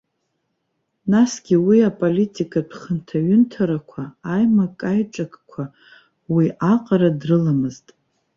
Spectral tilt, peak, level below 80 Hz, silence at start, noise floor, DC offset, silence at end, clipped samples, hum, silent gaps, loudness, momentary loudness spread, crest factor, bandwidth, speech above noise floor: -7.5 dB/octave; -4 dBFS; -60 dBFS; 1.05 s; -73 dBFS; under 0.1%; 0.6 s; under 0.1%; none; none; -19 LUFS; 14 LU; 16 dB; 7.8 kHz; 55 dB